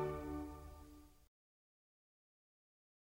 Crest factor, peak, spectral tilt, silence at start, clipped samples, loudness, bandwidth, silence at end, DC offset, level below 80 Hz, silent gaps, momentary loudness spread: 22 dB; -30 dBFS; -7.5 dB/octave; 0 s; under 0.1%; -48 LUFS; 16 kHz; 1.8 s; under 0.1%; -60 dBFS; none; 19 LU